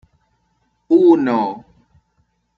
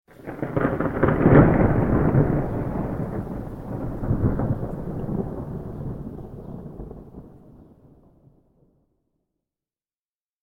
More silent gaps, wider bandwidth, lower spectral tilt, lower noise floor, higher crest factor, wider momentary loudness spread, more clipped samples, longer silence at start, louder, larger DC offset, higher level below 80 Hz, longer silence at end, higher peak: neither; first, 4.9 kHz vs 3.7 kHz; second, -8.5 dB/octave vs -11 dB/octave; second, -65 dBFS vs under -90 dBFS; second, 16 dB vs 22 dB; second, 14 LU vs 21 LU; neither; first, 0.9 s vs 0.2 s; first, -15 LUFS vs -23 LUFS; neither; second, -62 dBFS vs -36 dBFS; second, 1 s vs 2.8 s; about the same, -2 dBFS vs -2 dBFS